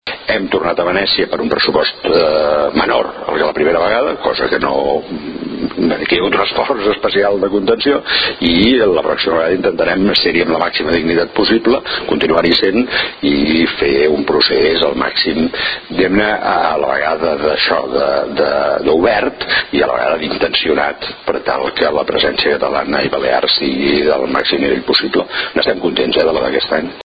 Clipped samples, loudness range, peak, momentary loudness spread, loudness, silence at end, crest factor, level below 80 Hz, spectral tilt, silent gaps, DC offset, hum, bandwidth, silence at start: under 0.1%; 2 LU; 0 dBFS; 5 LU; -14 LUFS; 0.05 s; 14 dB; -40 dBFS; -7 dB/octave; none; under 0.1%; none; 5.2 kHz; 0.05 s